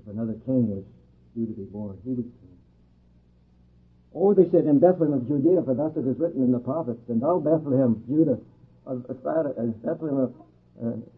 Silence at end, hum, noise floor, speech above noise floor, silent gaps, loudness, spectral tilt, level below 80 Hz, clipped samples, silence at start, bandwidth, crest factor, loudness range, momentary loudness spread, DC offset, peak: 0.15 s; none; -58 dBFS; 34 dB; none; -25 LUFS; -13.5 dB/octave; -62 dBFS; under 0.1%; 0.05 s; 2.8 kHz; 20 dB; 10 LU; 15 LU; under 0.1%; -6 dBFS